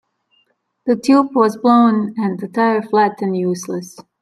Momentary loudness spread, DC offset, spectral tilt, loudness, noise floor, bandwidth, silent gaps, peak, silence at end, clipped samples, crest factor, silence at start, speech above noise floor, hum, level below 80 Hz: 13 LU; under 0.1%; -6.5 dB/octave; -16 LUFS; -63 dBFS; 13 kHz; none; -2 dBFS; 0.2 s; under 0.1%; 14 dB; 0.85 s; 48 dB; none; -66 dBFS